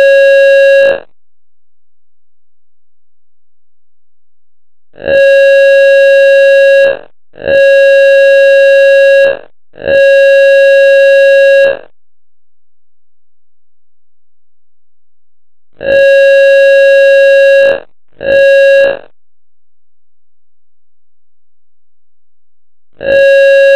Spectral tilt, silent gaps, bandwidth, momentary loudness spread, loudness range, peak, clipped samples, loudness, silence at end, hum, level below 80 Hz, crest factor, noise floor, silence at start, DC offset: -2.5 dB/octave; none; 10 kHz; 8 LU; 9 LU; -2 dBFS; under 0.1%; -5 LUFS; 0 s; none; -48 dBFS; 6 dB; under -90 dBFS; 0 s; 1%